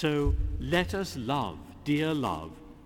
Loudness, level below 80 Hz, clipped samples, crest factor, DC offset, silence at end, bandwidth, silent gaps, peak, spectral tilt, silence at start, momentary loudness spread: -30 LUFS; -38 dBFS; under 0.1%; 18 dB; under 0.1%; 0 s; 17 kHz; none; -12 dBFS; -6 dB/octave; 0 s; 10 LU